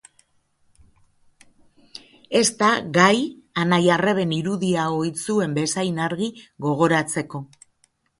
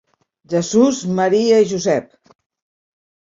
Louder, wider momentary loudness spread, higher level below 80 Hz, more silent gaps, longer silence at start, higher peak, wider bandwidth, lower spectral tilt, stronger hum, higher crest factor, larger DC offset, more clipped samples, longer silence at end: second, -21 LUFS vs -16 LUFS; first, 13 LU vs 8 LU; about the same, -62 dBFS vs -60 dBFS; neither; first, 2.3 s vs 0.5 s; about the same, -2 dBFS vs -2 dBFS; first, 11.5 kHz vs 7.8 kHz; about the same, -4.5 dB/octave vs -5 dB/octave; neither; first, 22 dB vs 16 dB; neither; neither; second, 0.75 s vs 1.3 s